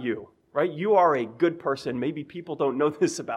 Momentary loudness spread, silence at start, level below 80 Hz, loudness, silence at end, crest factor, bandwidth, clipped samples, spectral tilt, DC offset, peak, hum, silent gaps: 12 LU; 0 s; -70 dBFS; -25 LUFS; 0 s; 16 dB; 12 kHz; under 0.1%; -5.5 dB/octave; under 0.1%; -10 dBFS; none; none